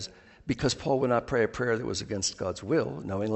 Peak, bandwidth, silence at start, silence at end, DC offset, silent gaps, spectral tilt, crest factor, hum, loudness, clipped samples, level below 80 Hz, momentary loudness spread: -12 dBFS; 8.4 kHz; 0 s; 0 s; under 0.1%; none; -4.5 dB/octave; 16 dB; none; -29 LUFS; under 0.1%; -54 dBFS; 8 LU